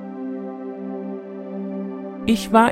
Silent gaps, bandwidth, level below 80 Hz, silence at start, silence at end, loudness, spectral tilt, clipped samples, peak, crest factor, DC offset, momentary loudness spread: none; 15.5 kHz; -52 dBFS; 0 s; 0 s; -25 LUFS; -5.5 dB/octave; under 0.1%; -2 dBFS; 22 dB; under 0.1%; 14 LU